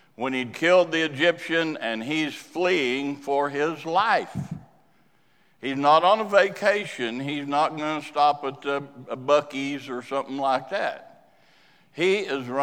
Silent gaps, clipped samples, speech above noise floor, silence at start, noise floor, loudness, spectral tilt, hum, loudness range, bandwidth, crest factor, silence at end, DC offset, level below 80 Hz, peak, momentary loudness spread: none; under 0.1%; 40 dB; 0.2 s; -64 dBFS; -24 LUFS; -4.5 dB/octave; none; 5 LU; 15 kHz; 20 dB; 0 s; under 0.1%; -70 dBFS; -4 dBFS; 12 LU